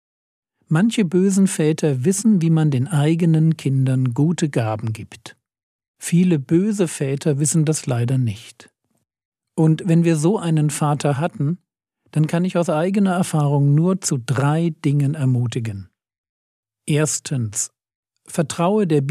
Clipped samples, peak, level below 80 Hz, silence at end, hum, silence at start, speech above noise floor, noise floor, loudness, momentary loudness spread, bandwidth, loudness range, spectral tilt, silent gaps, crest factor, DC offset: under 0.1%; -6 dBFS; -70 dBFS; 0 s; none; 0.7 s; 53 dB; -71 dBFS; -19 LUFS; 8 LU; 14 kHz; 5 LU; -6.5 dB/octave; 5.63-5.79 s, 5.88-5.94 s, 9.25-9.32 s, 16.18-16.63 s, 17.95-18.03 s; 14 dB; under 0.1%